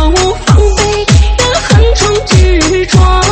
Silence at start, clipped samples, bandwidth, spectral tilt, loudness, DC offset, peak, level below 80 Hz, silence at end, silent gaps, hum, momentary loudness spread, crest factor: 0 s; 0.5%; 8.8 kHz; -4.5 dB/octave; -8 LUFS; under 0.1%; 0 dBFS; -12 dBFS; 0 s; none; none; 3 LU; 8 dB